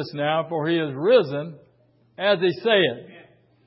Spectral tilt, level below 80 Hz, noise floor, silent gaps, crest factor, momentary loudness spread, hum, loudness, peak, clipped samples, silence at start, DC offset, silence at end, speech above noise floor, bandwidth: -10 dB/octave; -72 dBFS; -60 dBFS; none; 16 dB; 12 LU; none; -22 LUFS; -6 dBFS; under 0.1%; 0 s; under 0.1%; 0.45 s; 38 dB; 5.8 kHz